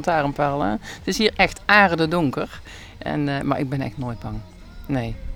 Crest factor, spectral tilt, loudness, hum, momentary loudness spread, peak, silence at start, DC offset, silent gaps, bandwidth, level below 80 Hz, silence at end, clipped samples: 22 dB; -5.5 dB/octave; -21 LUFS; none; 18 LU; 0 dBFS; 0 s; under 0.1%; none; 19 kHz; -40 dBFS; 0 s; under 0.1%